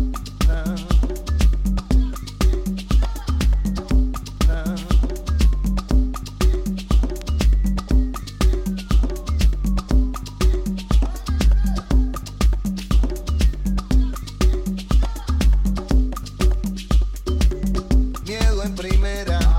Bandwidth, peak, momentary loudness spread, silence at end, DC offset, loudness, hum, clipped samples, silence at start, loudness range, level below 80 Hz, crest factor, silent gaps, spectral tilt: 14.5 kHz; -6 dBFS; 5 LU; 0 s; under 0.1%; -22 LUFS; none; under 0.1%; 0 s; 1 LU; -20 dBFS; 12 dB; none; -6 dB/octave